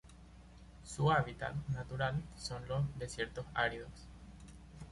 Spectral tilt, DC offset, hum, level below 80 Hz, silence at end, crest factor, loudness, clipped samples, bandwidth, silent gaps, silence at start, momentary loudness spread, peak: -5.5 dB/octave; under 0.1%; none; -54 dBFS; 0 s; 20 dB; -38 LUFS; under 0.1%; 11.5 kHz; none; 0.05 s; 24 LU; -20 dBFS